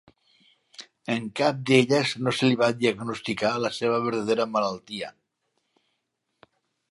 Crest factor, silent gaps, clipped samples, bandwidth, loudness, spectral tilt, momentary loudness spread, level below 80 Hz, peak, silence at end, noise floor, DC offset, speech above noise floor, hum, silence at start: 22 dB; none; under 0.1%; 11.5 kHz; -25 LUFS; -5 dB/octave; 15 LU; -68 dBFS; -4 dBFS; 1.8 s; -78 dBFS; under 0.1%; 54 dB; none; 0.8 s